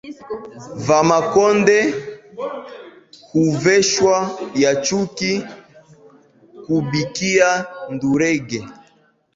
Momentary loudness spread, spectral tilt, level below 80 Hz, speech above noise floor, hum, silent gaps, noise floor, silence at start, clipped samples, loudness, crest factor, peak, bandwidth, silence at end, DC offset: 17 LU; -4.5 dB/octave; -56 dBFS; 39 dB; none; none; -57 dBFS; 0.05 s; under 0.1%; -17 LUFS; 18 dB; -2 dBFS; 7.8 kHz; 0.65 s; under 0.1%